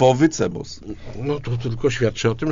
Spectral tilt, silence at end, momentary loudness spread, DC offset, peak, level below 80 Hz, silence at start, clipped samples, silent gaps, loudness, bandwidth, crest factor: -6 dB/octave; 0 s; 15 LU; under 0.1%; -4 dBFS; -40 dBFS; 0 s; under 0.1%; none; -22 LUFS; 7.6 kHz; 16 dB